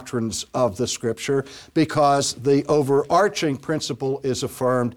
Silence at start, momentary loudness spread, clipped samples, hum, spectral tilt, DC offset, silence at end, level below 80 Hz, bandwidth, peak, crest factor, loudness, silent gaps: 0 s; 7 LU; under 0.1%; none; -5 dB/octave; under 0.1%; 0 s; -56 dBFS; 17.5 kHz; -8 dBFS; 14 dB; -22 LUFS; none